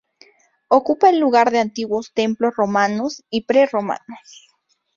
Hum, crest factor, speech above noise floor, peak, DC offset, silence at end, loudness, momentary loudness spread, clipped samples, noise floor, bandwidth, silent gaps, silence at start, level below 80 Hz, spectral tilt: none; 18 dB; 35 dB; -2 dBFS; under 0.1%; 0.8 s; -18 LUFS; 11 LU; under 0.1%; -53 dBFS; 7.6 kHz; none; 0.7 s; -64 dBFS; -5 dB/octave